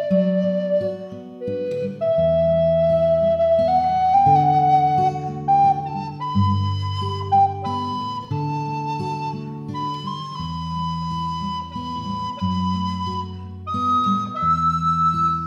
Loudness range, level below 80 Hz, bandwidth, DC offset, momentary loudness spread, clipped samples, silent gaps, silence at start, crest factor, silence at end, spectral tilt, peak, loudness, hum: 9 LU; -46 dBFS; 8.4 kHz; under 0.1%; 12 LU; under 0.1%; none; 0 s; 14 dB; 0 s; -8 dB/octave; -6 dBFS; -21 LUFS; none